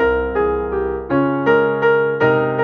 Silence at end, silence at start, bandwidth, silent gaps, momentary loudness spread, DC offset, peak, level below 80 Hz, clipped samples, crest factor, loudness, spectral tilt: 0 s; 0 s; 6.2 kHz; none; 5 LU; under 0.1%; -4 dBFS; -36 dBFS; under 0.1%; 12 dB; -17 LUFS; -8.5 dB/octave